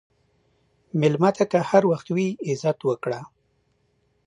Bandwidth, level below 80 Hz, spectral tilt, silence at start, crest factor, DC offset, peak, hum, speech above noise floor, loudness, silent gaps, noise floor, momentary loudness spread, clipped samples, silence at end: 10.5 kHz; -68 dBFS; -7 dB/octave; 0.95 s; 22 dB; under 0.1%; -4 dBFS; none; 46 dB; -23 LUFS; none; -68 dBFS; 10 LU; under 0.1%; 1 s